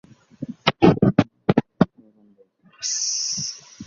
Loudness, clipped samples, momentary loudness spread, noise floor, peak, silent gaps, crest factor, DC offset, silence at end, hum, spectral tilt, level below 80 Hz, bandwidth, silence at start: -21 LUFS; under 0.1%; 13 LU; -57 dBFS; 0 dBFS; none; 22 dB; under 0.1%; 0.05 s; none; -4.5 dB/octave; -48 dBFS; 7.6 kHz; 0.4 s